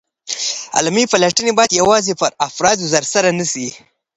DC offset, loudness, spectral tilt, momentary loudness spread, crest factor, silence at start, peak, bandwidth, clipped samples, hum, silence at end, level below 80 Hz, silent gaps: under 0.1%; -15 LUFS; -2.5 dB/octave; 8 LU; 16 dB; 0.25 s; 0 dBFS; 11 kHz; under 0.1%; none; 0.4 s; -54 dBFS; none